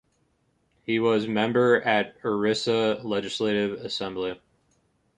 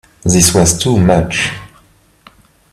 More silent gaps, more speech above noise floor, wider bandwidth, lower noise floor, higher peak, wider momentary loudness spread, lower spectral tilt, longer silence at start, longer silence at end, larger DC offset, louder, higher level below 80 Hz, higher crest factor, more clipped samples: neither; first, 45 dB vs 38 dB; second, 10 kHz vs 15 kHz; first, -69 dBFS vs -49 dBFS; second, -8 dBFS vs 0 dBFS; about the same, 10 LU vs 9 LU; about the same, -5 dB/octave vs -4 dB/octave; first, 0.9 s vs 0.25 s; second, 0.8 s vs 1.05 s; neither; second, -25 LUFS vs -11 LUFS; second, -64 dBFS vs -34 dBFS; about the same, 18 dB vs 14 dB; neither